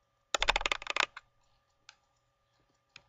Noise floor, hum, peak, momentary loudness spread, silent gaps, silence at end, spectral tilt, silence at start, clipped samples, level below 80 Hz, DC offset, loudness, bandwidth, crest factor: -76 dBFS; none; -12 dBFS; 5 LU; none; 1.9 s; 0 dB/octave; 0.35 s; under 0.1%; -52 dBFS; under 0.1%; -32 LUFS; 15.5 kHz; 26 dB